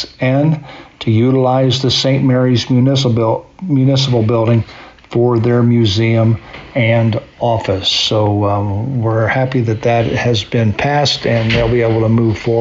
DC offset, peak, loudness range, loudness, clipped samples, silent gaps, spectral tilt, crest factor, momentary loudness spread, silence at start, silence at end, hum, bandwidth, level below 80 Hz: under 0.1%; -4 dBFS; 2 LU; -14 LUFS; under 0.1%; none; -5.5 dB/octave; 10 dB; 5 LU; 0 s; 0 s; none; 7.8 kHz; -40 dBFS